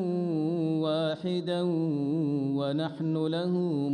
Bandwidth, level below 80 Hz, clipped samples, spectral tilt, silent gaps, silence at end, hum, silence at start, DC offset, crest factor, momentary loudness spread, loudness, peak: 9.8 kHz; -76 dBFS; under 0.1%; -8.5 dB/octave; none; 0 s; none; 0 s; under 0.1%; 10 dB; 2 LU; -29 LUFS; -18 dBFS